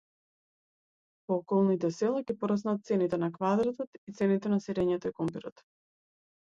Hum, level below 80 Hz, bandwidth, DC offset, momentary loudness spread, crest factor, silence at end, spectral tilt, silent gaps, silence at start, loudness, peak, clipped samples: none; -68 dBFS; 7.6 kHz; under 0.1%; 11 LU; 16 dB; 1 s; -8 dB/octave; 3.87-4.07 s; 1.3 s; -30 LUFS; -16 dBFS; under 0.1%